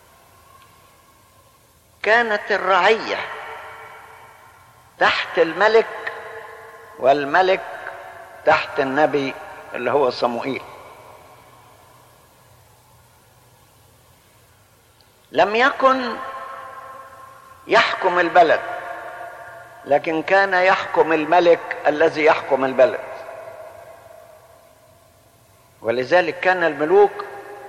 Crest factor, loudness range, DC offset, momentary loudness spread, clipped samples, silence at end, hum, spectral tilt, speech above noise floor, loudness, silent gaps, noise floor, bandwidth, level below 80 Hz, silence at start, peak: 16 dB; 8 LU; under 0.1%; 21 LU; under 0.1%; 0 s; none; -4.5 dB/octave; 36 dB; -18 LUFS; none; -54 dBFS; 14.5 kHz; -64 dBFS; 2.05 s; -4 dBFS